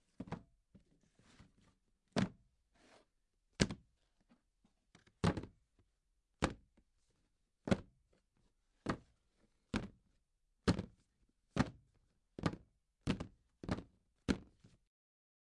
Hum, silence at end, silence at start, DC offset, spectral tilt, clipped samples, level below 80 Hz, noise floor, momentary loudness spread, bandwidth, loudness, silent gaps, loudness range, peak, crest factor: none; 1 s; 0.2 s; under 0.1%; -5.5 dB/octave; under 0.1%; -58 dBFS; -82 dBFS; 15 LU; 11 kHz; -42 LUFS; none; 3 LU; -10 dBFS; 34 dB